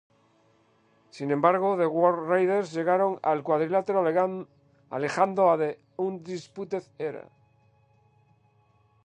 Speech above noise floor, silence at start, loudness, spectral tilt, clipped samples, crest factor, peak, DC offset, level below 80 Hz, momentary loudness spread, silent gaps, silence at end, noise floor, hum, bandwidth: 39 dB; 1.15 s; -26 LUFS; -7 dB/octave; under 0.1%; 20 dB; -6 dBFS; under 0.1%; -78 dBFS; 14 LU; none; 1.85 s; -64 dBFS; none; 9.8 kHz